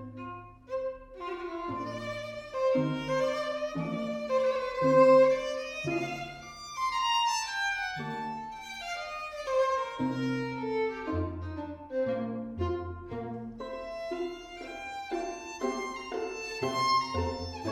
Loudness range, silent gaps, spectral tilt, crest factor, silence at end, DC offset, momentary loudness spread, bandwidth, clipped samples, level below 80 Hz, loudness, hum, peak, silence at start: 10 LU; none; -5 dB/octave; 20 dB; 0 s; under 0.1%; 13 LU; 12.5 kHz; under 0.1%; -54 dBFS; -31 LUFS; none; -12 dBFS; 0 s